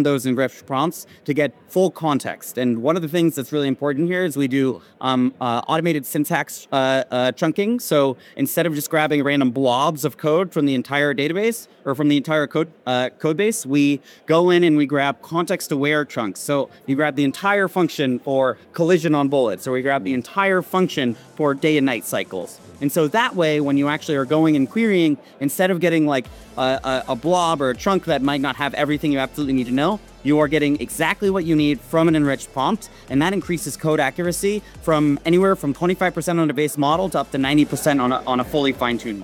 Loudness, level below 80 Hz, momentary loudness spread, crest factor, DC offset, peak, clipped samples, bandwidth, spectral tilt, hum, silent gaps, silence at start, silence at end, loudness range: -20 LUFS; -50 dBFS; 6 LU; 18 dB; under 0.1%; -2 dBFS; under 0.1%; 17.5 kHz; -5.5 dB/octave; none; none; 0 s; 0 s; 2 LU